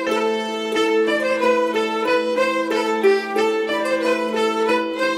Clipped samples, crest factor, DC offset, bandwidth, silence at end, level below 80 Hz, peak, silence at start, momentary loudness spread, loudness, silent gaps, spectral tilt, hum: under 0.1%; 14 dB; under 0.1%; 16 kHz; 0 s; -68 dBFS; -6 dBFS; 0 s; 3 LU; -19 LUFS; none; -3.5 dB/octave; none